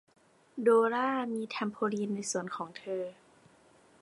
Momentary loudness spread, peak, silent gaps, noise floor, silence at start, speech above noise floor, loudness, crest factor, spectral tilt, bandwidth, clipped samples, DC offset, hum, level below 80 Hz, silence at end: 14 LU; -14 dBFS; none; -62 dBFS; 0.55 s; 31 dB; -32 LUFS; 20 dB; -4.5 dB/octave; 11.5 kHz; under 0.1%; under 0.1%; none; -80 dBFS; 0.9 s